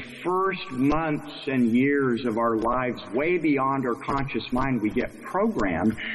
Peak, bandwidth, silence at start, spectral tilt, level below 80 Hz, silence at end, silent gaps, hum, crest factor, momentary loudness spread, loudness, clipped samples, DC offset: -12 dBFS; 12 kHz; 0 s; -7 dB/octave; -44 dBFS; 0 s; none; none; 12 dB; 6 LU; -25 LUFS; under 0.1%; under 0.1%